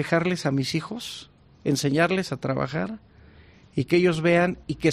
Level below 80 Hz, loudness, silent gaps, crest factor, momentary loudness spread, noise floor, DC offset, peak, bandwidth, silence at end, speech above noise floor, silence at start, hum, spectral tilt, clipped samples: -56 dBFS; -24 LUFS; none; 18 dB; 13 LU; -51 dBFS; under 0.1%; -8 dBFS; 14 kHz; 0 s; 28 dB; 0 s; none; -5.5 dB/octave; under 0.1%